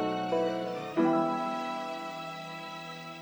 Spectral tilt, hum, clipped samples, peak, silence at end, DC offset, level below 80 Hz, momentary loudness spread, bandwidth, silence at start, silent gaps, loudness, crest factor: -6 dB/octave; none; under 0.1%; -16 dBFS; 0 s; under 0.1%; -72 dBFS; 13 LU; over 20 kHz; 0 s; none; -32 LUFS; 16 dB